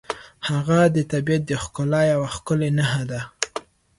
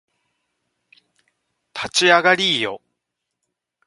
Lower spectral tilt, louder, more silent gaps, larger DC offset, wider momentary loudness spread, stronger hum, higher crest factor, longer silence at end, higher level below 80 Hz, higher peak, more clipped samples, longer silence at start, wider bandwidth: first, -5.5 dB/octave vs -2 dB/octave; second, -22 LUFS vs -16 LUFS; neither; neither; second, 11 LU vs 20 LU; neither; about the same, 20 dB vs 22 dB; second, 0.4 s vs 1.1 s; first, -50 dBFS vs -64 dBFS; about the same, -2 dBFS vs 0 dBFS; neither; second, 0.1 s vs 1.75 s; about the same, 11.5 kHz vs 11.5 kHz